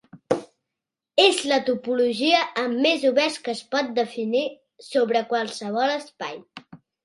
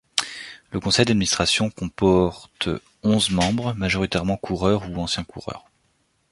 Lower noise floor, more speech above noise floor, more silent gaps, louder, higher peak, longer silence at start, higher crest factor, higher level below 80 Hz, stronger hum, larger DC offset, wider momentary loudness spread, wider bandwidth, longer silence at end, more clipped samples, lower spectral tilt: first, -86 dBFS vs -67 dBFS; first, 63 dB vs 45 dB; neither; about the same, -23 LUFS vs -22 LUFS; second, -4 dBFS vs 0 dBFS; about the same, 0.15 s vs 0.15 s; about the same, 20 dB vs 22 dB; second, -74 dBFS vs -42 dBFS; neither; neither; second, 11 LU vs 14 LU; about the same, 11.5 kHz vs 11.5 kHz; second, 0.3 s vs 0.7 s; neither; second, -3 dB/octave vs -4.5 dB/octave